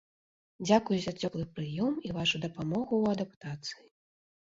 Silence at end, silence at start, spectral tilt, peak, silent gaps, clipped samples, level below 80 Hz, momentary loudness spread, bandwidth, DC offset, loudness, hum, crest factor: 0.8 s; 0.6 s; -5.5 dB/octave; -10 dBFS; 3.36-3.41 s; under 0.1%; -64 dBFS; 12 LU; 7.8 kHz; under 0.1%; -32 LUFS; none; 22 dB